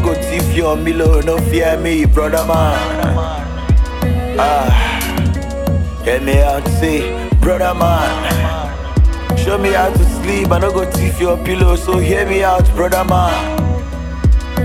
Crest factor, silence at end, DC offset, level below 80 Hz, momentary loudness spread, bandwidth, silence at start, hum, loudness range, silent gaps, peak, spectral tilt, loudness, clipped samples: 12 dB; 0 s; under 0.1%; -18 dBFS; 5 LU; 16.5 kHz; 0 s; none; 1 LU; none; 0 dBFS; -6 dB/octave; -15 LUFS; under 0.1%